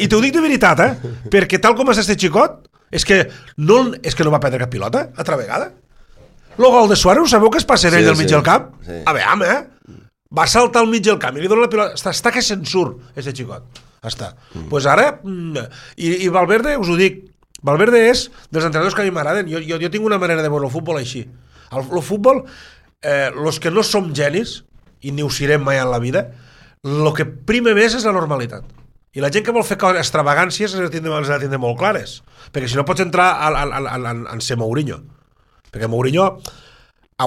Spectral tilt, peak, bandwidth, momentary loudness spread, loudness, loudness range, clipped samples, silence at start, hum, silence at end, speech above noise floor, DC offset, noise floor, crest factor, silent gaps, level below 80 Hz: -4.5 dB/octave; 0 dBFS; 16 kHz; 16 LU; -16 LUFS; 7 LU; under 0.1%; 0 s; none; 0 s; 40 dB; under 0.1%; -55 dBFS; 16 dB; none; -40 dBFS